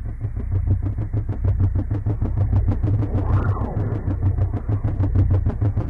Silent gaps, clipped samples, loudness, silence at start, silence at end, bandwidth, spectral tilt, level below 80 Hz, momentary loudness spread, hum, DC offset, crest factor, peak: none; under 0.1%; -22 LUFS; 0 s; 0 s; 2.7 kHz; -11.5 dB/octave; -26 dBFS; 4 LU; none; under 0.1%; 10 dB; -10 dBFS